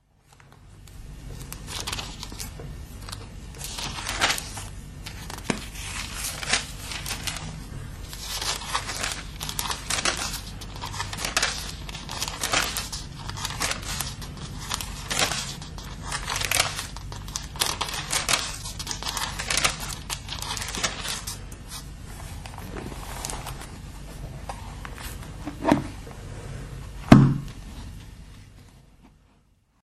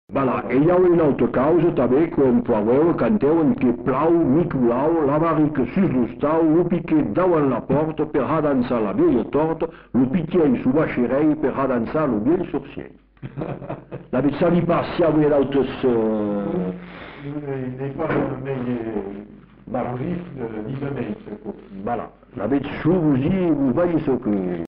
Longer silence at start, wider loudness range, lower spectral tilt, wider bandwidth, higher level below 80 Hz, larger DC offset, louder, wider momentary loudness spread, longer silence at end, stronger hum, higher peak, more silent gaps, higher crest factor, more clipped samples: first, 0.4 s vs 0.1 s; about the same, 11 LU vs 9 LU; second, -3.5 dB/octave vs -8 dB/octave; first, 13.5 kHz vs 4.8 kHz; first, -40 dBFS vs -46 dBFS; neither; second, -28 LUFS vs -20 LUFS; first, 16 LU vs 13 LU; first, 0.75 s vs 0 s; neither; first, 0 dBFS vs -10 dBFS; neither; first, 28 dB vs 10 dB; neither